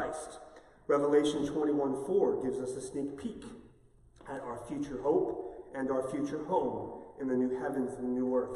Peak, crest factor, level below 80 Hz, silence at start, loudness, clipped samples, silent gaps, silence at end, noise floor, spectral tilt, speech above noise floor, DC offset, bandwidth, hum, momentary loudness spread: -16 dBFS; 18 dB; -62 dBFS; 0 s; -33 LUFS; under 0.1%; none; 0 s; -61 dBFS; -6 dB/octave; 29 dB; under 0.1%; 12 kHz; none; 14 LU